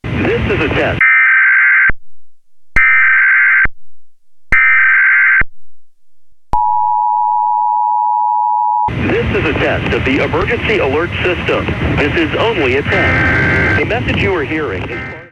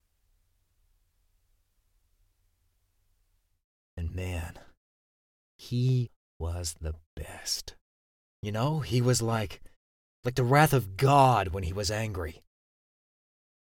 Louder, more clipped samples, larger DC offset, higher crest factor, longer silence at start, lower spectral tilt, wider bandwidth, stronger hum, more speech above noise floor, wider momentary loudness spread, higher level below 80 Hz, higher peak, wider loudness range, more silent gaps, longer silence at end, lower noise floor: first, -11 LUFS vs -28 LUFS; neither; neither; second, 12 dB vs 24 dB; second, 0.05 s vs 3.95 s; about the same, -6.5 dB/octave vs -5.5 dB/octave; second, 11 kHz vs 17 kHz; neither; second, 30 dB vs 45 dB; second, 8 LU vs 18 LU; first, -30 dBFS vs -48 dBFS; first, 0 dBFS vs -8 dBFS; second, 5 LU vs 17 LU; second, none vs 4.77-5.59 s, 6.16-6.40 s, 7.06-7.17 s, 7.81-8.43 s, 9.76-10.23 s; second, 0.05 s vs 1.35 s; second, -44 dBFS vs -72 dBFS